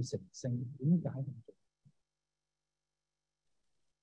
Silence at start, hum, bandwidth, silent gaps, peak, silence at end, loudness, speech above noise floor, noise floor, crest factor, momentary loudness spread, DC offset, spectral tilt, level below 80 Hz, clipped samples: 0 s; 50 Hz at -65 dBFS; 9 kHz; none; -20 dBFS; 2.5 s; -37 LUFS; over 54 dB; under -90 dBFS; 20 dB; 12 LU; under 0.1%; -8 dB/octave; -82 dBFS; under 0.1%